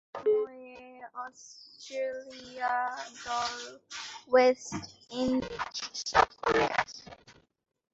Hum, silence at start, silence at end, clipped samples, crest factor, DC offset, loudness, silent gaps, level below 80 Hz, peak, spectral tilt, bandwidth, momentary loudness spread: none; 0.15 s; 0.65 s; under 0.1%; 24 dB; under 0.1%; -30 LUFS; none; -60 dBFS; -8 dBFS; -3 dB/octave; 8 kHz; 21 LU